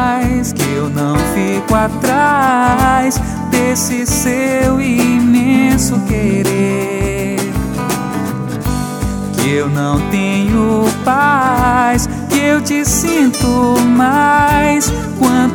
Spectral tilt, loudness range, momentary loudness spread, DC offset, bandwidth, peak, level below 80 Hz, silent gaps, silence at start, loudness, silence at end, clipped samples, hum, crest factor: -5 dB/octave; 5 LU; 7 LU; under 0.1%; 19 kHz; -2 dBFS; -28 dBFS; none; 0 s; -13 LUFS; 0 s; under 0.1%; none; 12 dB